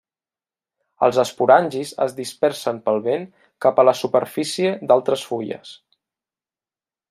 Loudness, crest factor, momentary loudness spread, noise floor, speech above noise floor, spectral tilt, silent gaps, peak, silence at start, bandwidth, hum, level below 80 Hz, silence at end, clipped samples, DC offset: -20 LUFS; 20 dB; 11 LU; under -90 dBFS; over 71 dB; -4.5 dB/octave; none; -2 dBFS; 1 s; 15.5 kHz; none; -70 dBFS; 1.35 s; under 0.1%; under 0.1%